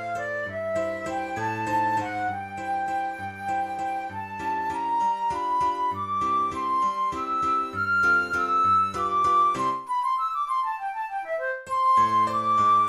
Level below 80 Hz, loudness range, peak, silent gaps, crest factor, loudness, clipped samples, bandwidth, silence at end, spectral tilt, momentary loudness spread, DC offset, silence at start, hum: -60 dBFS; 6 LU; -12 dBFS; none; 12 dB; -25 LUFS; under 0.1%; 14.5 kHz; 0 s; -5 dB/octave; 10 LU; under 0.1%; 0 s; none